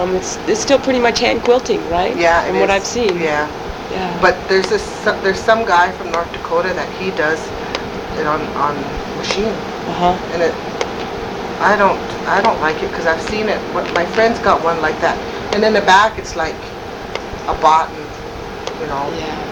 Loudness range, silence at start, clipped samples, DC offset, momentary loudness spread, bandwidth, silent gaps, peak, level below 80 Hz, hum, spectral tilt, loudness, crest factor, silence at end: 5 LU; 0 s; under 0.1%; under 0.1%; 11 LU; 19 kHz; none; 0 dBFS; -38 dBFS; none; -4 dB/octave; -16 LUFS; 16 dB; 0 s